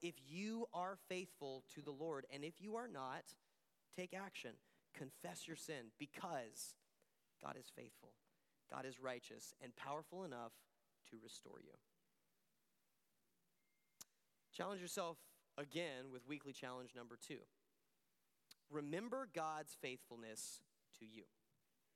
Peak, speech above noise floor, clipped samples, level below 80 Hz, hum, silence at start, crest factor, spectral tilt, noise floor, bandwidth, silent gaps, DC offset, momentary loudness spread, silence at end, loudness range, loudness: -30 dBFS; 35 dB; under 0.1%; under -90 dBFS; none; 0 s; 22 dB; -4 dB/octave; -87 dBFS; 16 kHz; none; under 0.1%; 16 LU; 0.7 s; 7 LU; -52 LUFS